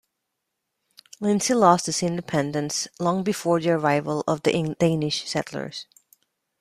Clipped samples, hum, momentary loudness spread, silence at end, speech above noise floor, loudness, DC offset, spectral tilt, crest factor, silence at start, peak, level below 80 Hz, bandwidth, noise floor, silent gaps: under 0.1%; none; 10 LU; 0.75 s; 57 dB; -23 LUFS; under 0.1%; -4.5 dB/octave; 22 dB; 1.2 s; -2 dBFS; -62 dBFS; 15 kHz; -80 dBFS; none